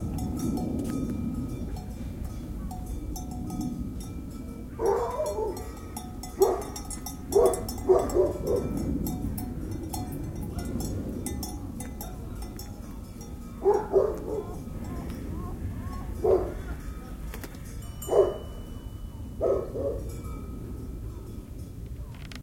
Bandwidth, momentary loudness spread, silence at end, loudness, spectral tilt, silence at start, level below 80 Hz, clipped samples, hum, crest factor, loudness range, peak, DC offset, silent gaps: 16.5 kHz; 16 LU; 0 s; -31 LUFS; -6.5 dB/octave; 0 s; -40 dBFS; under 0.1%; none; 22 dB; 8 LU; -8 dBFS; under 0.1%; none